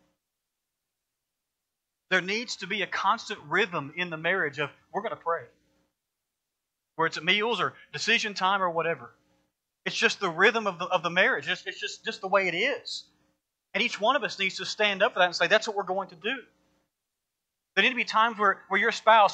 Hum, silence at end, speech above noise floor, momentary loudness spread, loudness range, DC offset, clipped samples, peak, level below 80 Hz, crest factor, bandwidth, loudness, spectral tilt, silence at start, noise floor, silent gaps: none; 0 s; 58 dB; 11 LU; 5 LU; under 0.1%; under 0.1%; -6 dBFS; -82 dBFS; 22 dB; 9.2 kHz; -26 LUFS; -3 dB/octave; 2.1 s; -85 dBFS; none